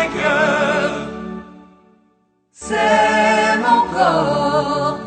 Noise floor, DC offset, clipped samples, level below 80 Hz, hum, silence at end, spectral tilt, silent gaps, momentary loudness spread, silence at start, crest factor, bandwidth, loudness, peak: -60 dBFS; under 0.1%; under 0.1%; -48 dBFS; none; 0 s; -4.5 dB/octave; none; 15 LU; 0 s; 16 dB; 9.4 kHz; -16 LUFS; -2 dBFS